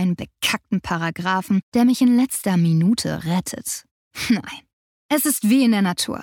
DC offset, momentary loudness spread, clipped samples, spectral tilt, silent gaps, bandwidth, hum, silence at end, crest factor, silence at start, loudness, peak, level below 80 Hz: under 0.1%; 12 LU; under 0.1%; -4.5 dB/octave; 1.63-1.72 s, 3.91-4.11 s, 4.73-5.09 s; 18.5 kHz; none; 0 s; 14 dB; 0 s; -20 LUFS; -6 dBFS; -54 dBFS